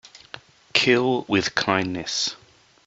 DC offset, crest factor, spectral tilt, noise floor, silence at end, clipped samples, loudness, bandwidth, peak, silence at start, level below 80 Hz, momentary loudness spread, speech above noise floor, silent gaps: under 0.1%; 22 dB; -3.5 dB/octave; -45 dBFS; 0.5 s; under 0.1%; -22 LUFS; 8 kHz; -2 dBFS; 0.15 s; -60 dBFS; 23 LU; 23 dB; none